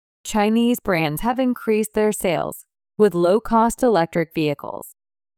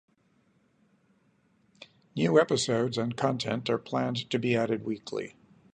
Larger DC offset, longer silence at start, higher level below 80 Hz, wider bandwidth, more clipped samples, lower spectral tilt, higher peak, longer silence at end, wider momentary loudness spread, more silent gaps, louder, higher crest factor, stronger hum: neither; second, 0.25 s vs 1.8 s; first, -46 dBFS vs -70 dBFS; first, 19 kHz vs 9.6 kHz; neither; about the same, -5.5 dB/octave vs -5 dB/octave; first, -6 dBFS vs -10 dBFS; about the same, 0.5 s vs 0.45 s; about the same, 12 LU vs 12 LU; neither; first, -20 LUFS vs -29 LUFS; second, 14 dB vs 22 dB; neither